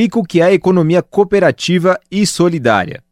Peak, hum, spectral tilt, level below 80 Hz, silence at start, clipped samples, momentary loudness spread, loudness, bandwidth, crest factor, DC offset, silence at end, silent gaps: 0 dBFS; none; -5.5 dB/octave; -48 dBFS; 0 s; under 0.1%; 4 LU; -13 LUFS; 15.5 kHz; 12 dB; under 0.1%; 0.15 s; none